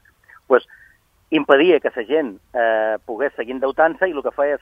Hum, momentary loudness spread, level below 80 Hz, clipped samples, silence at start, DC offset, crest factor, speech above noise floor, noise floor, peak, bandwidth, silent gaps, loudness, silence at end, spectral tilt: none; 10 LU; -60 dBFS; under 0.1%; 0.5 s; under 0.1%; 20 dB; 36 dB; -54 dBFS; 0 dBFS; 5 kHz; none; -19 LUFS; 0.05 s; -6.5 dB/octave